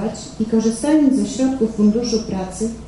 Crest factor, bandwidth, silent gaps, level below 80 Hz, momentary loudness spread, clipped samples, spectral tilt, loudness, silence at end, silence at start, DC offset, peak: 14 dB; 11.5 kHz; none; -42 dBFS; 10 LU; under 0.1%; -5.5 dB/octave; -18 LUFS; 0 s; 0 s; under 0.1%; -4 dBFS